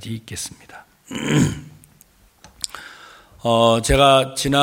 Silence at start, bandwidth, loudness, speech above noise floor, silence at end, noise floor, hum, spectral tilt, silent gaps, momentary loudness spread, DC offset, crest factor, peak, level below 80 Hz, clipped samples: 0 s; 17 kHz; -18 LUFS; 35 dB; 0 s; -53 dBFS; none; -4.5 dB/octave; none; 19 LU; under 0.1%; 20 dB; -2 dBFS; -36 dBFS; under 0.1%